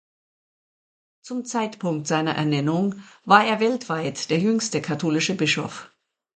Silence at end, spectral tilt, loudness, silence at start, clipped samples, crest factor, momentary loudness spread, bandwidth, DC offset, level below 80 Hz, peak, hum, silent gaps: 0.5 s; -4.5 dB/octave; -22 LUFS; 1.25 s; under 0.1%; 24 dB; 12 LU; 9.4 kHz; under 0.1%; -68 dBFS; 0 dBFS; none; none